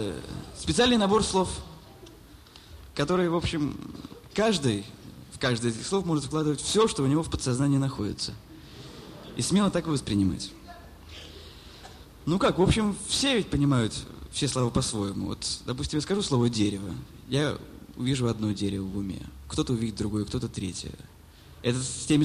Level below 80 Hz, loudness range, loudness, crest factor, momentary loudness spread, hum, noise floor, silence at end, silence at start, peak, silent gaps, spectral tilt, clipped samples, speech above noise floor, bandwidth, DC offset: -46 dBFS; 4 LU; -27 LUFS; 20 dB; 21 LU; none; -50 dBFS; 0 s; 0 s; -8 dBFS; none; -5 dB/octave; under 0.1%; 23 dB; 15 kHz; under 0.1%